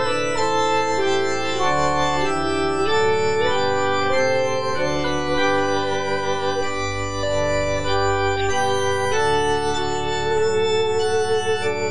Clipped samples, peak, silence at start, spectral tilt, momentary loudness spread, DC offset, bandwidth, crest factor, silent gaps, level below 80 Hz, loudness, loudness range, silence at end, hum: under 0.1%; -6 dBFS; 0 s; -4 dB/octave; 3 LU; 4%; 10 kHz; 12 dB; none; -42 dBFS; -21 LUFS; 2 LU; 0 s; none